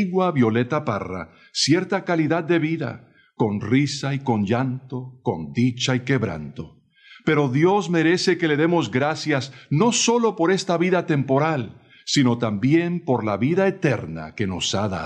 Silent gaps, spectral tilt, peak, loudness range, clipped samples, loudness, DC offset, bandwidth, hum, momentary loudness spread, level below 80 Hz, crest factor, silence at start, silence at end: none; -5 dB/octave; -4 dBFS; 4 LU; under 0.1%; -21 LUFS; under 0.1%; 10 kHz; none; 10 LU; -58 dBFS; 16 dB; 0 s; 0 s